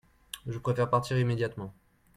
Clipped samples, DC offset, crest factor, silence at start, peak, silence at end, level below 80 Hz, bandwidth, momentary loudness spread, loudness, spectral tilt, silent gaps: under 0.1%; under 0.1%; 20 dB; 0.35 s; -12 dBFS; 0.45 s; -58 dBFS; 14.5 kHz; 16 LU; -30 LUFS; -6.5 dB/octave; none